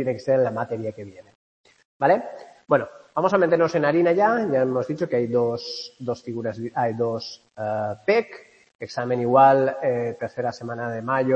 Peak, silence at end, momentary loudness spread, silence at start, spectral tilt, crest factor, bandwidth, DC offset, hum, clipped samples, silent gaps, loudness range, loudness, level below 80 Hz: -4 dBFS; 0 s; 13 LU; 0 s; -7 dB/octave; 20 dB; 8.2 kHz; under 0.1%; none; under 0.1%; 1.35-1.64 s, 1.85-2.00 s, 8.75-8.79 s; 5 LU; -23 LUFS; -68 dBFS